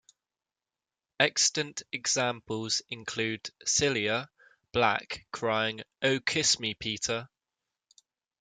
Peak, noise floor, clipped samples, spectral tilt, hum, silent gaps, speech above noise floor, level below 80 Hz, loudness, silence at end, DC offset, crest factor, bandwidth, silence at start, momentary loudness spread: -6 dBFS; under -90 dBFS; under 0.1%; -2 dB/octave; none; none; over 60 dB; -64 dBFS; -29 LUFS; 1.15 s; under 0.1%; 26 dB; 11 kHz; 1.2 s; 9 LU